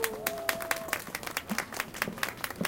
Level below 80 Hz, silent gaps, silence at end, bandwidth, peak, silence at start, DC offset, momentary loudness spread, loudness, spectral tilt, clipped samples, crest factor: -60 dBFS; none; 0 s; 17 kHz; -6 dBFS; 0 s; under 0.1%; 4 LU; -33 LUFS; -2.5 dB/octave; under 0.1%; 28 dB